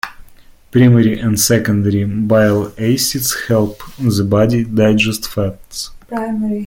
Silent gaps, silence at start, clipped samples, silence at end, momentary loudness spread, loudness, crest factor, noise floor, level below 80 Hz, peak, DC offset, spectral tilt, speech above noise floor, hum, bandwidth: none; 0.05 s; under 0.1%; 0 s; 10 LU; -14 LUFS; 14 dB; -41 dBFS; -40 dBFS; -2 dBFS; under 0.1%; -5.5 dB/octave; 28 dB; none; 17 kHz